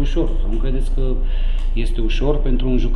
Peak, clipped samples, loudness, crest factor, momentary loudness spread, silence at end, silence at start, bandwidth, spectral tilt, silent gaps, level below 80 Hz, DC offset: -4 dBFS; under 0.1%; -23 LUFS; 12 dB; 4 LU; 0 s; 0 s; 6 kHz; -7.5 dB/octave; none; -16 dBFS; under 0.1%